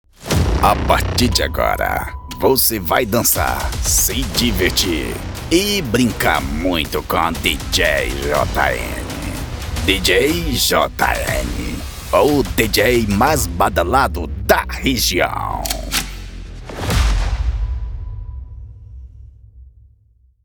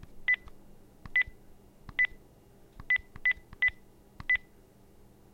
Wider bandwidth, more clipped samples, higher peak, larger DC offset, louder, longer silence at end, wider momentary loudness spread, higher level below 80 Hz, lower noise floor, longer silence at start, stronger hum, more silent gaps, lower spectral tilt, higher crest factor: first, over 20 kHz vs 16 kHz; neither; first, 0 dBFS vs -16 dBFS; neither; first, -17 LUFS vs -30 LUFS; second, 0.75 s vs 0.95 s; first, 12 LU vs 2 LU; first, -26 dBFS vs -54 dBFS; about the same, -54 dBFS vs -57 dBFS; about the same, 0.2 s vs 0.1 s; neither; neither; about the same, -3.5 dB/octave vs -3.5 dB/octave; about the same, 18 dB vs 18 dB